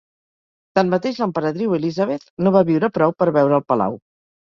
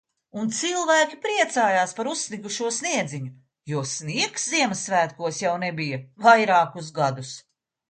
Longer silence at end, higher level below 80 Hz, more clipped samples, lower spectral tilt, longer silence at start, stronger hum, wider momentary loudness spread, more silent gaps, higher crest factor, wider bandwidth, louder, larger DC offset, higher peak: about the same, 0.4 s vs 0.5 s; first, -60 dBFS vs -72 dBFS; neither; first, -8 dB/octave vs -3 dB/octave; first, 0.75 s vs 0.35 s; neither; second, 7 LU vs 12 LU; first, 2.30-2.37 s vs none; about the same, 18 dB vs 22 dB; second, 7.2 kHz vs 9.6 kHz; first, -19 LUFS vs -23 LUFS; neither; about the same, -2 dBFS vs -2 dBFS